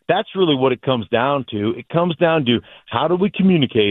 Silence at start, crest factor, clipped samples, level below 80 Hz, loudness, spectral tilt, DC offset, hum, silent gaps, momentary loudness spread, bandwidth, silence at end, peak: 0.1 s; 16 dB; under 0.1%; -54 dBFS; -18 LUFS; -10 dB/octave; under 0.1%; none; none; 6 LU; 4.1 kHz; 0 s; -2 dBFS